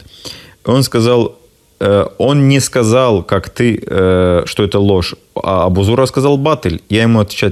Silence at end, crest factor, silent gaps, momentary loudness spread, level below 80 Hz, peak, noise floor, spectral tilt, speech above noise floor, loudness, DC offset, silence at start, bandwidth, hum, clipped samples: 0 s; 12 dB; none; 8 LU; -42 dBFS; 0 dBFS; -33 dBFS; -6 dB/octave; 21 dB; -13 LUFS; under 0.1%; 0.25 s; 14 kHz; none; under 0.1%